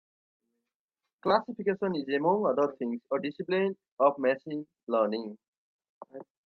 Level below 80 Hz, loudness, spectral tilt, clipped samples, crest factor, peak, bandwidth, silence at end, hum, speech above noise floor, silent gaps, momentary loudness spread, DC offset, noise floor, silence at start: -80 dBFS; -30 LUFS; -8 dB/octave; under 0.1%; 20 dB; -10 dBFS; 6.2 kHz; 0.25 s; none; 59 dB; 3.92-3.97 s, 4.83-4.87 s, 5.48-5.79 s, 5.89-6.01 s; 13 LU; under 0.1%; -89 dBFS; 1.25 s